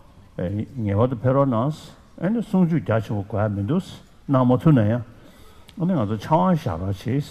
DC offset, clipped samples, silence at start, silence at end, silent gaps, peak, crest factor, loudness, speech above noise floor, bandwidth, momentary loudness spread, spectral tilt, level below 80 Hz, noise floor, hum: under 0.1%; under 0.1%; 0.4 s; 0 s; none; -6 dBFS; 16 dB; -22 LUFS; 25 dB; 13.5 kHz; 11 LU; -9 dB/octave; -50 dBFS; -46 dBFS; none